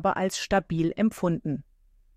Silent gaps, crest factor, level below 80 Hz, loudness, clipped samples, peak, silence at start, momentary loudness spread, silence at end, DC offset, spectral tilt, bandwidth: none; 16 dB; -50 dBFS; -27 LUFS; under 0.1%; -12 dBFS; 0 s; 7 LU; 0.55 s; under 0.1%; -5.5 dB/octave; 15.5 kHz